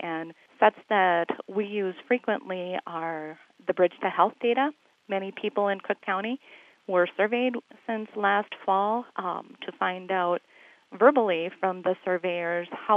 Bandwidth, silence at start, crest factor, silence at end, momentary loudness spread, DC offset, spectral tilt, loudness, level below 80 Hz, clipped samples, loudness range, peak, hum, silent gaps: 5.8 kHz; 0 s; 22 dB; 0 s; 11 LU; under 0.1%; -7 dB/octave; -27 LUFS; under -90 dBFS; under 0.1%; 2 LU; -6 dBFS; none; none